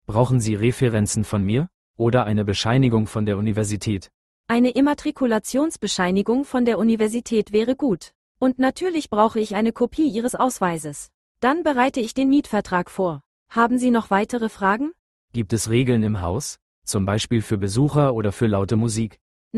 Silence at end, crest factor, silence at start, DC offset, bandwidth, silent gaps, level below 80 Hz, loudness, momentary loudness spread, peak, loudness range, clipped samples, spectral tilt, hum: 0 s; 18 dB; 0.1 s; under 0.1%; 12.5 kHz; 1.74-1.94 s, 4.14-4.44 s, 8.15-8.35 s, 11.14-11.35 s, 13.26-13.46 s, 14.99-15.28 s, 16.62-16.82 s, 19.21-19.51 s; -48 dBFS; -21 LUFS; 7 LU; -4 dBFS; 2 LU; under 0.1%; -6 dB/octave; none